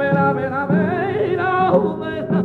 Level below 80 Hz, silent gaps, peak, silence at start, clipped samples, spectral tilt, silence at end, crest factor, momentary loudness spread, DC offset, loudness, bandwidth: -52 dBFS; none; -4 dBFS; 0 s; under 0.1%; -9.5 dB/octave; 0 s; 14 dB; 5 LU; under 0.1%; -19 LUFS; 4.7 kHz